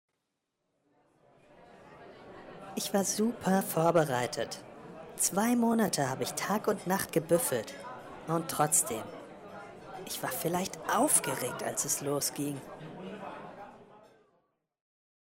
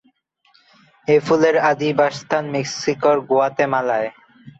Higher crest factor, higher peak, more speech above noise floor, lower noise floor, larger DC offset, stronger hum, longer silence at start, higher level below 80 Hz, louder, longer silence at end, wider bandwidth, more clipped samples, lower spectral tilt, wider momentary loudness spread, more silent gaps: about the same, 20 dB vs 16 dB; second, -14 dBFS vs -4 dBFS; first, 53 dB vs 43 dB; first, -83 dBFS vs -60 dBFS; neither; neither; first, 1.6 s vs 1.1 s; second, -70 dBFS vs -64 dBFS; second, -30 LUFS vs -18 LUFS; first, 1.2 s vs 0.1 s; first, 16 kHz vs 8 kHz; neither; second, -3.5 dB/octave vs -5 dB/octave; first, 21 LU vs 8 LU; neither